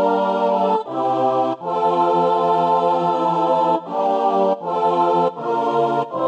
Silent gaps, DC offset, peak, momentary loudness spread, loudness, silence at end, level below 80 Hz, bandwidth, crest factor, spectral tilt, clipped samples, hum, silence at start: none; under 0.1%; -6 dBFS; 4 LU; -18 LUFS; 0 s; -80 dBFS; 8.4 kHz; 12 dB; -7.5 dB/octave; under 0.1%; none; 0 s